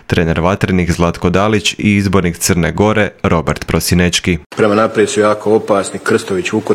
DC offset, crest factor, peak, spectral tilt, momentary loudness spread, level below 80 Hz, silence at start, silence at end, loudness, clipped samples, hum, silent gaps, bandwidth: under 0.1%; 12 dB; 0 dBFS; -5 dB/octave; 4 LU; -36 dBFS; 0.1 s; 0 s; -13 LUFS; under 0.1%; none; 4.46-4.50 s; 16.5 kHz